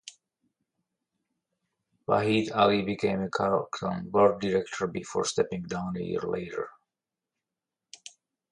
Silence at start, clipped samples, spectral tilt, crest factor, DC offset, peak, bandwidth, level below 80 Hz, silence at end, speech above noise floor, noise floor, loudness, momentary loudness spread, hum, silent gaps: 0.05 s; under 0.1%; -5 dB/octave; 22 dB; under 0.1%; -8 dBFS; 11 kHz; -62 dBFS; 1.8 s; 62 dB; -89 dBFS; -28 LUFS; 16 LU; none; none